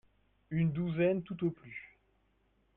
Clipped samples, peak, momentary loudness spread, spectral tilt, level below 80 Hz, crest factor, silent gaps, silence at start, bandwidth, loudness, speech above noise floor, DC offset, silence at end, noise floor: under 0.1%; -20 dBFS; 16 LU; -11 dB/octave; -66 dBFS; 16 dB; none; 0.5 s; 3.9 kHz; -34 LUFS; 40 dB; under 0.1%; 0.9 s; -73 dBFS